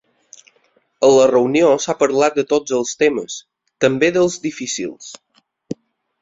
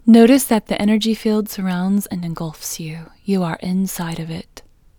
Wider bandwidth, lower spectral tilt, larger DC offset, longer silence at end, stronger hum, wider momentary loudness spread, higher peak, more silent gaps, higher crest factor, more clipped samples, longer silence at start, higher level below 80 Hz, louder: second, 7.8 kHz vs over 20 kHz; second, -4 dB/octave vs -5.5 dB/octave; neither; about the same, 0.5 s vs 0.4 s; neither; first, 20 LU vs 15 LU; about the same, -2 dBFS vs 0 dBFS; neither; about the same, 16 dB vs 18 dB; neither; first, 1 s vs 0.05 s; second, -60 dBFS vs -48 dBFS; about the same, -16 LUFS vs -18 LUFS